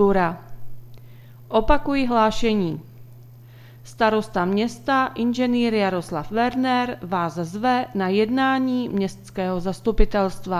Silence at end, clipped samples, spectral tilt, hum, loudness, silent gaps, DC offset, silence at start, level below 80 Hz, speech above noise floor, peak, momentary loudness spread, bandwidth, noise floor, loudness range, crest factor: 0 s; under 0.1%; -6 dB/octave; none; -22 LUFS; none; under 0.1%; 0 s; -36 dBFS; 23 dB; 0 dBFS; 7 LU; 15 kHz; -44 dBFS; 2 LU; 22 dB